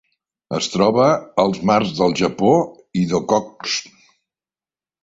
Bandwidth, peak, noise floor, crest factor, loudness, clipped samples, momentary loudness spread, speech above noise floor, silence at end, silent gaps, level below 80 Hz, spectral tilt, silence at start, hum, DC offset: 8 kHz; -2 dBFS; under -90 dBFS; 18 dB; -18 LUFS; under 0.1%; 8 LU; over 73 dB; 1.2 s; none; -54 dBFS; -5 dB/octave; 0.5 s; none; under 0.1%